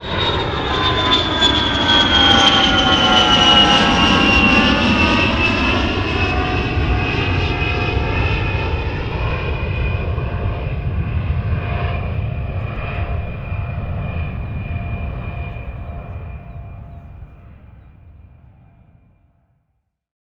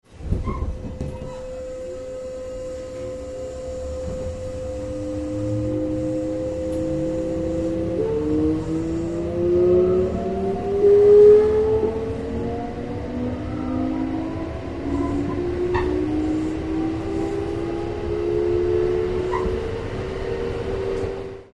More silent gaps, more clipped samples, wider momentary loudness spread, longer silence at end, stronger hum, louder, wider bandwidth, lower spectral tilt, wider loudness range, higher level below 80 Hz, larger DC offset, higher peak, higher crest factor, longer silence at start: neither; neither; first, 17 LU vs 14 LU; first, 2.1 s vs 0.1 s; neither; first, -16 LUFS vs -23 LUFS; about the same, 9.4 kHz vs 9.8 kHz; second, -4.5 dB/octave vs -8 dB/octave; first, 18 LU vs 14 LU; first, -26 dBFS vs -36 dBFS; neither; first, 0 dBFS vs -4 dBFS; about the same, 18 dB vs 18 dB; about the same, 0 s vs 0.1 s